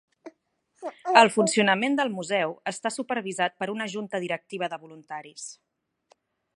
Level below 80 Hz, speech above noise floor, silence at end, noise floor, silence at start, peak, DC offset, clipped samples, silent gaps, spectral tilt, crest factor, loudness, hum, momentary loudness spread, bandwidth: -78 dBFS; 44 dB; 1.05 s; -70 dBFS; 0.25 s; -2 dBFS; under 0.1%; under 0.1%; none; -3.5 dB/octave; 26 dB; -25 LUFS; none; 21 LU; 11.5 kHz